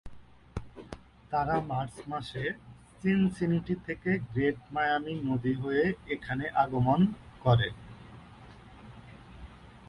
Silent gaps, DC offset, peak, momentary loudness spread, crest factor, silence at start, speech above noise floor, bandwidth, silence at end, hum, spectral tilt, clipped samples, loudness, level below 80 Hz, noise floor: none; under 0.1%; -12 dBFS; 24 LU; 20 dB; 0.05 s; 22 dB; 11 kHz; 0.05 s; none; -8 dB/octave; under 0.1%; -30 LUFS; -52 dBFS; -51 dBFS